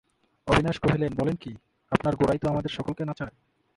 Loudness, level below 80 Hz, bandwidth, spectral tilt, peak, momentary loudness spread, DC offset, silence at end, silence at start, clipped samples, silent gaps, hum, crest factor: -27 LUFS; -46 dBFS; 11.5 kHz; -7 dB/octave; -4 dBFS; 13 LU; under 0.1%; 0.5 s; 0.45 s; under 0.1%; none; none; 24 dB